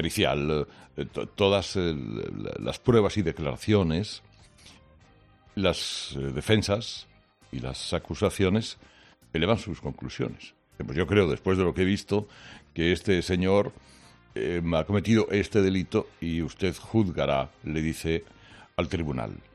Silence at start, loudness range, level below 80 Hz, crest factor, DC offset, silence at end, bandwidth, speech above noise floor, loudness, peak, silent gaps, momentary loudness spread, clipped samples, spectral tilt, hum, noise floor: 0 s; 4 LU; -50 dBFS; 20 dB; under 0.1%; 0.15 s; 13.5 kHz; 31 dB; -27 LUFS; -6 dBFS; none; 13 LU; under 0.1%; -6 dB/octave; none; -58 dBFS